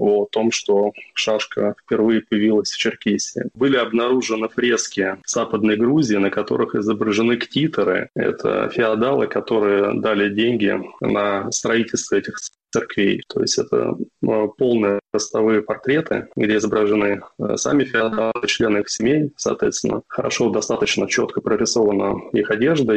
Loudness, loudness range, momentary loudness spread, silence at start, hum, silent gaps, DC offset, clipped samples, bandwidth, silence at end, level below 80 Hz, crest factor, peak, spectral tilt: -19 LUFS; 2 LU; 5 LU; 0 s; none; none; under 0.1%; under 0.1%; 8.8 kHz; 0 s; -56 dBFS; 12 dB; -6 dBFS; -4 dB/octave